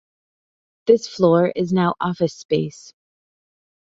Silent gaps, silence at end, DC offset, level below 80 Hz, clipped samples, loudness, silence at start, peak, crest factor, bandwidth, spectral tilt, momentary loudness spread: 2.45-2.49 s; 1.25 s; under 0.1%; -60 dBFS; under 0.1%; -19 LUFS; 0.85 s; -2 dBFS; 20 dB; 7.8 kHz; -7 dB/octave; 8 LU